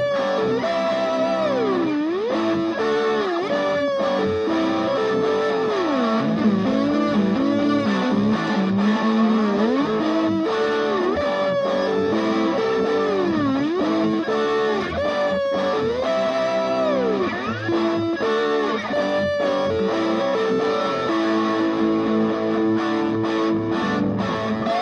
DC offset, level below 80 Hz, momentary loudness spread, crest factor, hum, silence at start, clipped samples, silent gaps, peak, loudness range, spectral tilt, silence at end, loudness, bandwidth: under 0.1%; -54 dBFS; 2 LU; 12 dB; none; 0 s; under 0.1%; none; -8 dBFS; 2 LU; -6.5 dB/octave; 0 s; -21 LUFS; 9.8 kHz